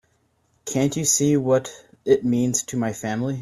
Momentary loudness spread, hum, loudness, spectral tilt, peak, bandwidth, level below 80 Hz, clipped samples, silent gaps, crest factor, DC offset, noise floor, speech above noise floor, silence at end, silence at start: 11 LU; none; -21 LUFS; -4.5 dB/octave; -6 dBFS; 16 kHz; -58 dBFS; under 0.1%; none; 18 dB; under 0.1%; -66 dBFS; 44 dB; 0 s; 0.65 s